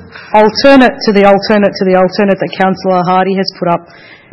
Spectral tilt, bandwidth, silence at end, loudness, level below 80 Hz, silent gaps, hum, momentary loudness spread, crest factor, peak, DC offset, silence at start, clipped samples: -6.5 dB/octave; 8.6 kHz; 0.2 s; -9 LUFS; -42 dBFS; none; none; 8 LU; 10 dB; 0 dBFS; under 0.1%; 0 s; 1%